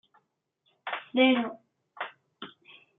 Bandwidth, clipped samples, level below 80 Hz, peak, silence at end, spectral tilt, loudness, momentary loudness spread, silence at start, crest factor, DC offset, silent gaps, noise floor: 3.9 kHz; under 0.1%; -90 dBFS; -10 dBFS; 0.5 s; -1 dB/octave; -28 LUFS; 23 LU; 0.85 s; 22 dB; under 0.1%; none; -76 dBFS